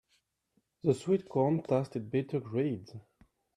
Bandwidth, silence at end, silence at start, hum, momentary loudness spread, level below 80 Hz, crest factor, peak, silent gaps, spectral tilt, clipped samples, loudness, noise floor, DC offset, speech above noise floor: 10.5 kHz; 0.55 s; 0.85 s; none; 10 LU; -72 dBFS; 20 dB; -14 dBFS; none; -8.5 dB/octave; under 0.1%; -32 LUFS; -77 dBFS; under 0.1%; 46 dB